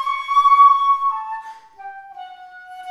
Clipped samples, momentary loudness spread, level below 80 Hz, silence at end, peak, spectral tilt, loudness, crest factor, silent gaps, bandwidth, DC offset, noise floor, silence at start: under 0.1%; 26 LU; -68 dBFS; 0 s; -2 dBFS; 1.5 dB/octave; -14 LUFS; 16 dB; none; 11.5 kHz; under 0.1%; -39 dBFS; 0 s